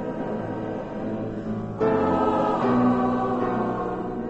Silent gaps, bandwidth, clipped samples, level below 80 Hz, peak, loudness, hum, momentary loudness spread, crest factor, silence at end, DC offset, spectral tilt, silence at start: none; 8 kHz; under 0.1%; -48 dBFS; -10 dBFS; -25 LUFS; none; 10 LU; 14 dB; 0 s; under 0.1%; -8.5 dB/octave; 0 s